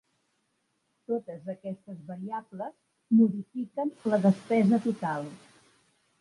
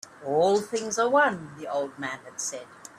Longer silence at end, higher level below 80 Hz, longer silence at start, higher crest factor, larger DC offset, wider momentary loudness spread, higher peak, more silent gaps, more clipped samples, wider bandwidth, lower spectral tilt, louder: first, 0.85 s vs 0.1 s; second, -78 dBFS vs -72 dBFS; first, 1.1 s vs 0.05 s; about the same, 16 dB vs 18 dB; neither; first, 17 LU vs 12 LU; about the same, -12 dBFS vs -10 dBFS; neither; neither; second, 11 kHz vs 14 kHz; first, -8.5 dB/octave vs -3 dB/octave; about the same, -28 LUFS vs -26 LUFS